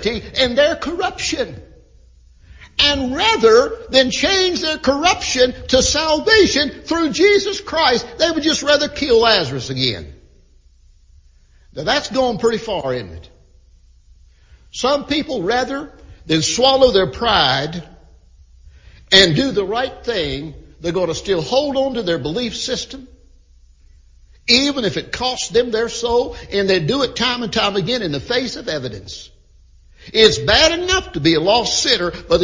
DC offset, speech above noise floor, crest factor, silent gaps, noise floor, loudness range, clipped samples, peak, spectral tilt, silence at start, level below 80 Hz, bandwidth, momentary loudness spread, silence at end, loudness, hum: under 0.1%; 33 dB; 18 dB; none; -49 dBFS; 8 LU; under 0.1%; 0 dBFS; -3 dB/octave; 0 s; -40 dBFS; 7.6 kHz; 12 LU; 0 s; -16 LUFS; none